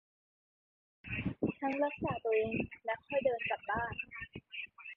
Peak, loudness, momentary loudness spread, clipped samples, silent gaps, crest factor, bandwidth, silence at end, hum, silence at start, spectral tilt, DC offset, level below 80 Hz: -20 dBFS; -37 LUFS; 11 LU; under 0.1%; none; 18 dB; 5.4 kHz; 0 s; none; 1.05 s; -4.5 dB/octave; under 0.1%; -60 dBFS